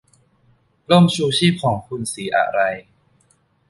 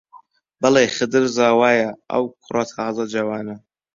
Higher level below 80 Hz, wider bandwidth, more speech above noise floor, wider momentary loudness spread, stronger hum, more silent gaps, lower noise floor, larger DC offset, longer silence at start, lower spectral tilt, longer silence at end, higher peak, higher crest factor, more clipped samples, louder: first, -56 dBFS vs -62 dBFS; first, 11.5 kHz vs 7.6 kHz; first, 43 dB vs 31 dB; about the same, 11 LU vs 10 LU; neither; neither; first, -60 dBFS vs -50 dBFS; neither; first, 0.9 s vs 0.15 s; first, -5.5 dB/octave vs -4 dB/octave; first, 0.9 s vs 0.4 s; about the same, -2 dBFS vs -2 dBFS; about the same, 18 dB vs 18 dB; neither; about the same, -18 LUFS vs -19 LUFS